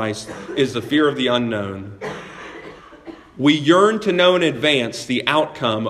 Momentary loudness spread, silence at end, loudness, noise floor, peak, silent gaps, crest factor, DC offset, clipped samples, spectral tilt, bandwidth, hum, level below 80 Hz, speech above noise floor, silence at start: 19 LU; 0 s; -18 LUFS; -40 dBFS; 0 dBFS; none; 20 dB; under 0.1%; under 0.1%; -5 dB/octave; 13 kHz; none; -56 dBFS; 22 dB; 0 s